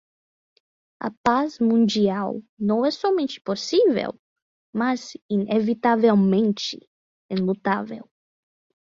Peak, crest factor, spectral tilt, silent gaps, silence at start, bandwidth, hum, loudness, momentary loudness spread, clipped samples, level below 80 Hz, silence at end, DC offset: -4 dBFS; 18 dB; -6 dB/octave; 1.17-1.24 s, 2.49-2.57 s, 4.19-4.36 s, 4.42-4.73 s, 5.22-5.29 s, 6.87-7.29 s; 1 s; 7.6 kHz; none; -22 LUFS; 12 LU; under 0.1%; -64 dBFS; 0.85 s; under 0.1%